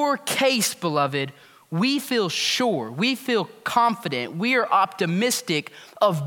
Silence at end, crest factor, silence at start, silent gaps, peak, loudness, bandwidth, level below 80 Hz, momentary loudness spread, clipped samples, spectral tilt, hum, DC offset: 0 s; 18 dB; 0 s; none; -6 dBFS; -23 LUFS; 18 kHz; -76 dBFS; 7 LU; under 0.1%; -3.5 dB/octave; none; under 0.1%